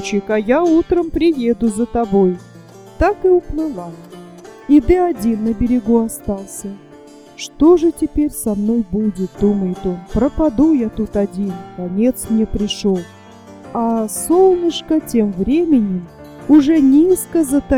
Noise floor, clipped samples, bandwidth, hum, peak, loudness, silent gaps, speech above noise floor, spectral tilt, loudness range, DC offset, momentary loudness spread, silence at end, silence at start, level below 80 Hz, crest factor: -40 dBFS; under 0.1%; 16.5 kHz; none; 0 dBFS; -16 LUFS; none; 25 dB; -6 dB/octave; 3 LU; under 0.1%; 14 LU; 0 s; 0 s; -34 dBFS; 14 dB